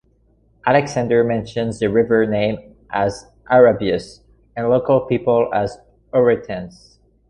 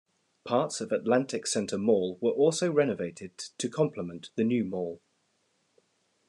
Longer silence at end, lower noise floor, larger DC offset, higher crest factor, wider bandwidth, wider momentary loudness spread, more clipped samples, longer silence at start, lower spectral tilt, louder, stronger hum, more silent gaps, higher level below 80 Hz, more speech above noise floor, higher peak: second, 0.6 s vs 1.3 s; second, -57 dBFS vs -73 dBFS; neither; about the same, 16 dB vs 18 dB; about the same, 10.5 kHz vs 11 kHz; about the same, 12 LU vs 13 LU; neither; first, 0.65 s vs 0.45 s; first, -6.5 dB/octave vs -5 dB/octave; first, -18 LUFS vs -29 LUFS; neither; neither; first, -48 dBFS vs -76 dBFS; second, 40 dB vs 45 dB; first, -2 dBFS vs -12 dBFS